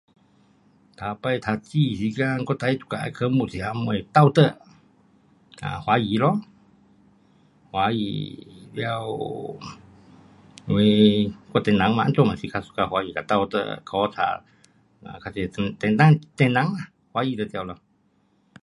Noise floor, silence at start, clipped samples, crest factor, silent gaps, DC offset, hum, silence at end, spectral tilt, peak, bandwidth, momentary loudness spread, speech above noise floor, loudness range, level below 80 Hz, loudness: -64 dBFS; 1 s; under 0.1%; 22 dB; none; under 0.1%; none; 0.9 s; -7.5 dB/octave; -2 dBFS; 11.5 kHz; 17 LU; 42 dB; 7 LU; -54 dBFS; -23 LUFS